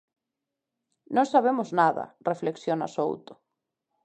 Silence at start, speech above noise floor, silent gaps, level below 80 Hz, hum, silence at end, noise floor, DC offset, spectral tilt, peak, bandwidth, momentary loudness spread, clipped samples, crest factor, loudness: 1.1 s; 60 dB; none; -80 dBFS; none; 0.7 s; -86 dBFS; under 0.1%; -6 dB/octave; -8 dBFS; 9 kHz; 9 LU; under 0.1%; 20 dB; -26 LUFS